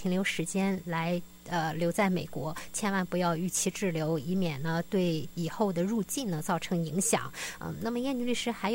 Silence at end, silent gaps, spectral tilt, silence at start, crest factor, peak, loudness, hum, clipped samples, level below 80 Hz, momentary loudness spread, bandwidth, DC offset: 0 s; none; -4.5 dB/octave; 0 s; 18 dB; -14 dBFS; -31 LUFS; none; under 0.1%; -60 dBFS; 7 LU; 16.5 kHz; under 0.1%